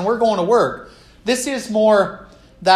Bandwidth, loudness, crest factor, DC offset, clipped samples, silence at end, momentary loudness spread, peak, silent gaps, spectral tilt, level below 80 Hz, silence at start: 14 kHz; -18 LUFS; 16 dB; under 0.1%; under 0.1%; 0 s; 13 LU; -2 dBFS; none; -4 dB/octave; -52 dBFS; 0 s